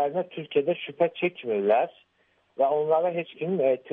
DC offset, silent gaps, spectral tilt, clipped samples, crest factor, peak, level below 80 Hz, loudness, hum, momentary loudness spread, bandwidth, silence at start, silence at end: under 0.1%; none; -9 dB/octave; under 0.1%; 16 dB; -10 dBFS; -78 dBFS; -26 LUFS; none; 8 LU; 3.9 kHz; 0 s; 0 s